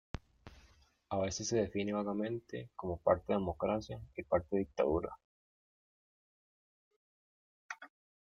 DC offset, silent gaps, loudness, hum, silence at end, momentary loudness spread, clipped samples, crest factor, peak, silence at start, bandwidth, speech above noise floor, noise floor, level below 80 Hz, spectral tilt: under 0.1%; 5.24-7.69 s; -36 LUFS; none; 0.4 s; 16 LU; under 0.1%; 24 dB; -14 dBFS; 0.15 s; 7.6 kHz; 31 dB; -67 dBFS; -60 dBFS; -5.5 dB/octave